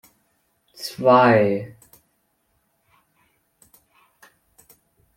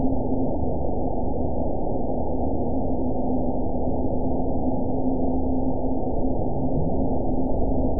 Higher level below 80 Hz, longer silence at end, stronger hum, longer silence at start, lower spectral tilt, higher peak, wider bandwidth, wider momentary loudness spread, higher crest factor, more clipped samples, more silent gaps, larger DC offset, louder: second, -68 dBFS vs -30 dBFS; first, 3.5 s vs 0 s; neither; first, 0.8 s vs 0 s; second, -6.5 dB/octave vs -18.5 dB/octave; first, -2 dBFS vs -10 dBFS; first, 16.5 kHz vs 1 kHz; first, 20 LU vs 2 LU; first, 22 dB vs 14 dB; neither; neither; second, under 0.1% vs 6%; first, -18 LUFS vs -26 LUFS